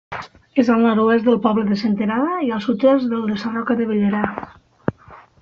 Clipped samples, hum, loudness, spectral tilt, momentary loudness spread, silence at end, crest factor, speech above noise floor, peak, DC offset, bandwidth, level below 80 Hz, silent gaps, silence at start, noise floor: under 0.1%; none; -19 LUFS; -5.5 dB/octave; 12 LU; 0.25 s; 16 dB; 27 dB; -2 dBFS; under 0.1%; 6.8 kHz; -56 dBFS; none; 0.1 s; -45 dBFS